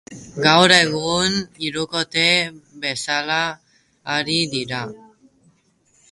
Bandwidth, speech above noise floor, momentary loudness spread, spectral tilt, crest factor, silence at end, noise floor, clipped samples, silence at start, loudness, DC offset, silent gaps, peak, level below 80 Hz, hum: 11.5 kHz; 41 dB; 15 LU; -3 dB/octave; 22 dB; 1.15 s; -61 dBFS; under 0.1%; 0.1 s; -18 LUFS; under 0.1%; none; 0 dBFS; -56 dBFS; none